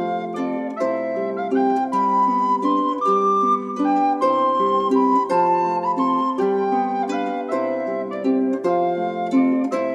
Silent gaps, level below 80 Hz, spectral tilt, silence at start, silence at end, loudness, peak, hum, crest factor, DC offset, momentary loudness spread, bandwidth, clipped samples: none; -74 dBFS; -7 dB/octave; 0 s; 0 s; -20 LUFS; -8 dBFS; none; 12 dB; under 0.1%; 6 LU; 9.4 kHz; under 0.1%